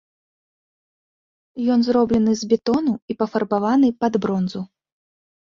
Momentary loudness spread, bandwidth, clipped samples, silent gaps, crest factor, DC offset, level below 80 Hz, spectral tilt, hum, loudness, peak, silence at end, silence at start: 9 LU; 7.4 kHz; under 0.1%; 3.02-3.08 s; 16 dB; under 0.1%; -54 dBFS; -6.5 dB/octave; none; -20 LUFS; -6 dBFS; 0.8 s; 1.55 s